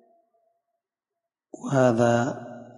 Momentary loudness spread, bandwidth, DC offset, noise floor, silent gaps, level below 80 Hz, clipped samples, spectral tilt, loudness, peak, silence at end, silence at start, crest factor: 18 LU; 11 kHz; under 0.1%; -87 dBFS; none; -66 dBFS; under 0.1%; -6.5 dB/octave; -23 LUFS; -8 dBFS; 0.15 s; 1.6 s; 20 dB